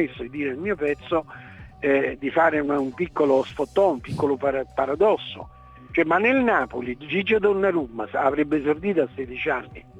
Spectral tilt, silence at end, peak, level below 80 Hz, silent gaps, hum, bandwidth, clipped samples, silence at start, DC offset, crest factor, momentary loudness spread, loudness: -7 dB/octave; 0 s; -6 dBFS; -52 dBFS; none; none; 9.4 kHz; under 0.1%; 0 s; under 0.1%; 16 dB; 9 LU; -23 LUFS